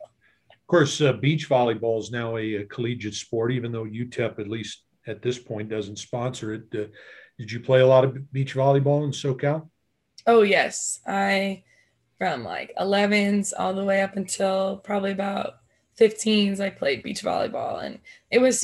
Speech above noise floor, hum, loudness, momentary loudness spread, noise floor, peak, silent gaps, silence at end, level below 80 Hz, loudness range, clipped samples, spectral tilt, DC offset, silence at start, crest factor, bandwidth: 40 dB; none; -24 LUFS; 13 LU; -63 dBFS; -6 dBFS; none; 0 s; -66 dBFS; 7 LU; under 0.1%; -5 dB/octave; under 0.1%; 0 s; 18 dB; 12.5 kHz